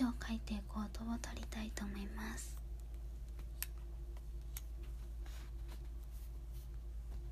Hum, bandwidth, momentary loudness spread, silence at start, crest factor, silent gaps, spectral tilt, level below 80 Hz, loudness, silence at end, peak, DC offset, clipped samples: none; 15.5 kHz; 7 LU; 0 s; 26 dB; none; -5 dB/octave; -46 dBFS; -47 LUFS; 0 s; -20 dBFS; under 0.1%; under 0.1%